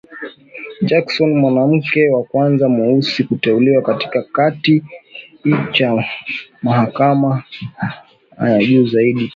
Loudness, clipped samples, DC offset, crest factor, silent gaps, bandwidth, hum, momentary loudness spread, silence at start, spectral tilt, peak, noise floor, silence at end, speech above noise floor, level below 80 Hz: -15 LUFS; under 0.1%; under 0.1%; 14 dB; none; 7.4 kHz; none; 14 LU; 0.1 s; -8 dB/octave; 0 dBFS; -34 dBFS; 0 s; 19 dB; -58 dBFS